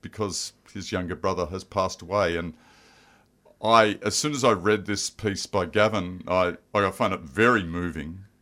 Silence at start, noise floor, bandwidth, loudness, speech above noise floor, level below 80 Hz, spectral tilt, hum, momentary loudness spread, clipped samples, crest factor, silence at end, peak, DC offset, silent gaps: 0.05 s; -59 dBFS; 16 kHz; -25 LUFS; 34 dB; -52 dBFS; -4 dB/octave; none; 11 LU; under 0.1%; 22 dB; 0.15 s; -4 dBFS; under 0.1%; none